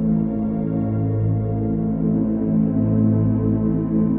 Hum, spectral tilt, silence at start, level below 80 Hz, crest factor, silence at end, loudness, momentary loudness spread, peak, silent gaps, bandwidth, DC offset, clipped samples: none; -13.5 dB/octave; 0 s; -38 dBFS; 12 dB; 0 s; -20 LUFS; 4 LU; -8 dBFS; none; 2.4 kHz; under 0.1%; under 0.1%